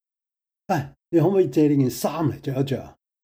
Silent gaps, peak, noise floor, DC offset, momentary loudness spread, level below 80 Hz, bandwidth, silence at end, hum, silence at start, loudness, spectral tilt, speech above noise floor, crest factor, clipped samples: none; -8 dBFS; -87 dBFS; under 0.1%; 8 LU; -60 dBFS; 16.5 kHz; 0.35 s; none; 0.7 s; -23 LUFS; -7 dB/octave; 66 dB; 14 dB; under 0.1%